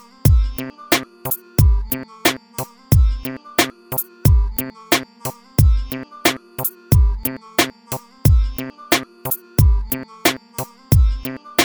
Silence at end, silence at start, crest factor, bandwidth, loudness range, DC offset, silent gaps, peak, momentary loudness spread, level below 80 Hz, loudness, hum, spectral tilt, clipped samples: 0 s; 0.25 s; 18 dB; over 20 kHz; 1 LU; under 0.1%; none; 0 dBFS; 12 LU; -22 dBFS; -19 LUFS; none; -4.5 dB/octave; under 0.1%